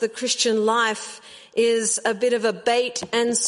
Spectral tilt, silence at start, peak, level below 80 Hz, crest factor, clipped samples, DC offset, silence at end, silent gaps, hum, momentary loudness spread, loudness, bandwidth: -1.5 dB/octave; 0 s; -8 dBFS; -70 dBFS; 14 dB; under 0.1%; under 0.1%; 0 s; none; none; 9 LU; -21 LUFS; 11.5 kHz